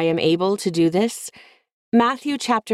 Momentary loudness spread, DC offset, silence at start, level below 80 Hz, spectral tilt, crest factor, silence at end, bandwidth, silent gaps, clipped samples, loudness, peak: 6 LU; under 0.1%; 0 s; -64 dBFS; -5 dB/octave; 14 dB; 0 s; 14.5 kHz; 1.73-1.92 s; under 0.1%; -20 LUFS; -6 dBFS